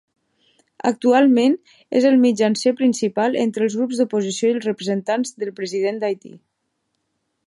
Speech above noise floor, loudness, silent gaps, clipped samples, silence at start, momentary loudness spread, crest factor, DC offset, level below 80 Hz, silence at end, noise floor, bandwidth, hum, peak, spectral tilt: 55 dB; -19 LUFS; none; under 0.1%; 0.85 s; 10 LU; 16 dB; under 0.1%; -74 dBFS; 1.1 s; -73 dBFS; 11.5 kHz; none; -4 dBFS; -5 dB/octave